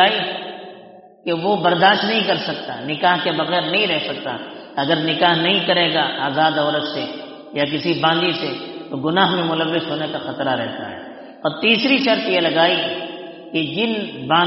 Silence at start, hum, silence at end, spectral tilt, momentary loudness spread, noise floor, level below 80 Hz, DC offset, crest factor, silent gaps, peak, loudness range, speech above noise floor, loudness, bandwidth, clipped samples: 0 s; none; 0 s; -2 dB/octave; 14 LU; -43 dBFS; -64 dBFS; under 0.1%; 18 dB; none; 0 dBFS; 2 LU; 24 dB; -18 LUFS; 6 kHz; under 0.1%